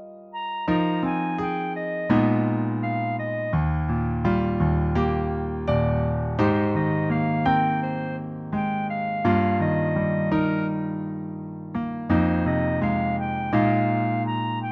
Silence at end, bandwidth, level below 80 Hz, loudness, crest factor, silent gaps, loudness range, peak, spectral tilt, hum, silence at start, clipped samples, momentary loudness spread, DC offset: 0 s; 5.8 kHz; -38 dBFS; -24 LUFS; 16 dB; none; 1 LU; -8 dBFS; -10 dB/octave; none; 0 s; under 0.1%; 9 LU; under 0.1%